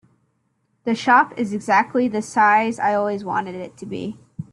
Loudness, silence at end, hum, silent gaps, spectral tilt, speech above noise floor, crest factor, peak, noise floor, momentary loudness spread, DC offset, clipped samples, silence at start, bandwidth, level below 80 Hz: -19 LUFS; 0.1 s; none; none; -5 dB/octave; 49 dB; 18 dB; -4 dBFS; -68 dBFS; 16 LU; under 0.1%; under 0.1%; 0.85 s; 11.5 kHz; -66 dBFS